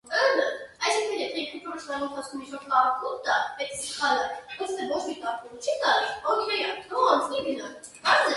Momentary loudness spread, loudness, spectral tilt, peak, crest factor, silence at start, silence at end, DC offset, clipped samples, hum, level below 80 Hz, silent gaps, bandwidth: 11 LU; -27 LUFS; -1.5 dB/octave; -6 dBFS; 20 dB; 0.05 s; 0 s; under 0.1%; under 0.1%; none; -66 dBFS; none; 11.5 kHz